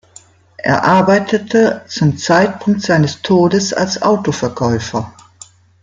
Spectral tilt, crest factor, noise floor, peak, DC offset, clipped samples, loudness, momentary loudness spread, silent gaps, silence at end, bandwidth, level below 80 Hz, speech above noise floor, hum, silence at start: -5.5 dB/octave; 14 dB; -44 dBFS; -2 dBFS; under 0.1%; under 0.1%; -14 LUFS; 8 LU; none; 0.75 s; 9.4 kHz; -50 dBFS; 31 dB; none; 0.6 s